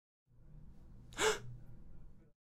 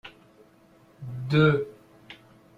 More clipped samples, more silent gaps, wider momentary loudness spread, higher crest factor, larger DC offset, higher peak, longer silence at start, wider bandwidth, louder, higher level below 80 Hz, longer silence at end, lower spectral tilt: neither; neither; about the same, 26 LU vs 27 LU; about the same, 24 dB vs 22 dB; neither; second, -20 dBFS vs -6 dBFS; first, 0.3 s vs 0.05 s; first, 16 kHz vs 7 kHz; second, -37 LUFS vs -24 LUFS; about the same, -58 dBFS vs -58 dBFS; second, 0.25 s vs 0.45 s; second, -2 dB/octave vs -8.5 dB/octave